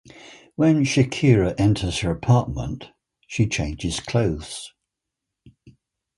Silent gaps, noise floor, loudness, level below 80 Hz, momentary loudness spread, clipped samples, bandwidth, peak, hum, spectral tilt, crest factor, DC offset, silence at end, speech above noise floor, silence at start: none; -83 dBFS; -21 LUFS; -40 dBFS; 16 LU; under 0.1%; 11.5 kHz; -2 dBFS; none; -6 dB/octave; 20 dB; under 0.1%; 0.45 s; 63 dB; 0.15 s